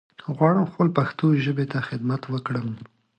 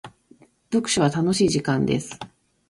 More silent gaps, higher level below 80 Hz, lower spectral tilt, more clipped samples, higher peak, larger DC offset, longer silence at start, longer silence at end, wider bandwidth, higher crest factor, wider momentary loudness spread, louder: neither; second, -64 dBFS vs -54 dBFS; first, -9 dB/octave vs -5 dB/octave; neither; about the same, -4 dBFS vs -6 dBFS; neither; first, 0.25 s vs 0.05 s; about the same, 0.35 s vs 0.4 s; second, 8.6 kHz vs 11.5 kHz; about the same, 20 dB vs 18 dB; second, 10 LU vs 17 LU; about the same, -23 LUFS vs -22 LUFS